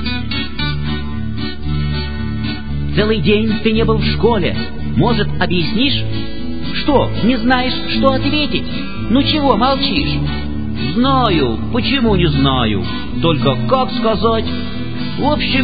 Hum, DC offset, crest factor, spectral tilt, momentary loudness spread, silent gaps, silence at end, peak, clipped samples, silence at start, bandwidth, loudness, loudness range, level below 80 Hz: none; 7%; 16 dB; -9.5 dB/octave; 9 LU; none; 0 s; 0 dBFS; under 0.1%; 0 s; 5 kHz; -16 LUFS; 2 LU; -28 dBFS